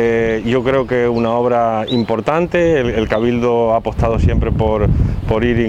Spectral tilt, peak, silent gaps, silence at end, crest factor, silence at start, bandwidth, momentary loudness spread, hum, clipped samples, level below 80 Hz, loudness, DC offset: -8 dB/octave; 0 dBFS; none; 0 s; 14 dB; 0 s; 8.6 kHz; 3 LU; none; under 0.1%; -26 dBFS; -15 LUFS; under 0.1%